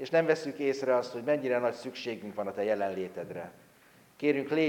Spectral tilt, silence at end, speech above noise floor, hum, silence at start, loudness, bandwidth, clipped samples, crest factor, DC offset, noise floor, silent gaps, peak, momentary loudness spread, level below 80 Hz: -6 dB/octave; 0 s; 30 dB; none; 0 s; -31 LUFS; 17 kHz; under 0.1%; 18 dB; under 0.1%; -60 dBFS; none; -12 dBFS; 11 LU; -78 dBFS